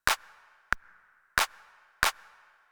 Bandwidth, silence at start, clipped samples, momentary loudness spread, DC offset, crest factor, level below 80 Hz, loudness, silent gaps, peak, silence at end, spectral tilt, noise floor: over 20 kHz; 0.05 s; under 0.1%; 5 LU; under 0.1%; 30 dB; -52 dBFS; -30 LUFS; none; -4 dBFS; 0.6 s; 0 dB/octave; -61 dBFS